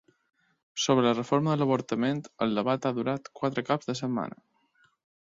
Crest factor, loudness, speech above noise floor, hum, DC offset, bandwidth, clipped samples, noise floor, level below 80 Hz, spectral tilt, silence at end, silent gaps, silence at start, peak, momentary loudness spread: 18 dB; -28 LUFS; 40 dB; none; under 0.1%; 7.8 kHz; under 0.1%; -67 dBFS; -70 dBFS; -5.5 dB/octave; 0.95 s; none; 0.75 s; -10 dBFS; 8 LU